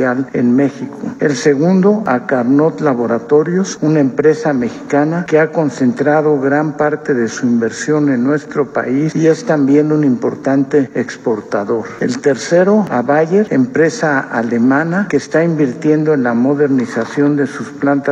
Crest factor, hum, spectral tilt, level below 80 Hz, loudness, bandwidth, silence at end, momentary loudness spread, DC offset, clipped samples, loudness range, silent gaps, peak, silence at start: 12 dB; none; -7 dB/octave; -60 dBFS; -14 LUFS; 9.2 kHz; 0 s; 6 LU; under 0.1%; under 0.1%; 1 LU; none; 0 dBFS; 0 s